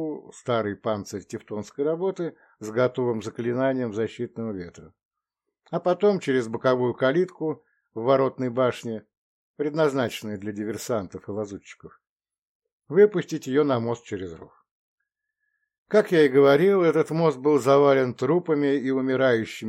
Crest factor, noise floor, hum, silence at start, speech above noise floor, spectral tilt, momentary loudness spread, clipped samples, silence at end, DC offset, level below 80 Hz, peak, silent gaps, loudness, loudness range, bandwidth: 18 dB; -84 dBFS; none; 0 s; 60 dB; -6.5 dB/octave; 16 LU; under 0.1%; 0 s; under 0.1%; -70 dBFS; -6 dBFS; 5.05-5.11 s, 9.17-9.54 s, 12.09-12.16 s, 12.42-12.60 s, 12.72-12.80 s, 14.71-14.98 s, 15.78-15.86 s; -24 LUFS; 8 LU; 14 kHz